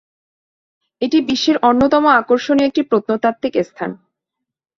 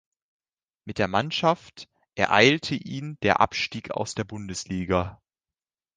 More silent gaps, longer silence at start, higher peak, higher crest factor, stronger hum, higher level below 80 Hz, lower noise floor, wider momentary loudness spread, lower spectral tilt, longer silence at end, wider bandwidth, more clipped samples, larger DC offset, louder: neither; first, 1 s vs 0.85 s; about the same, -2 dBFS vs -2 dBFS; second, 16 dB vs 24 dB; neither; about the same, -54 dBFS vs -50 dBFS; second, -81 dBFS vs under -90 dBFS; second, 11 LU vs 16 LU; about the same, -5 dB/octave vs -4.5 dB/octave; about the same, 0.8 s vs 0.8 s; second, 7.4 kHz vs 10 kHz; neither; neither; first, -15 LUFS vs -25 LUFS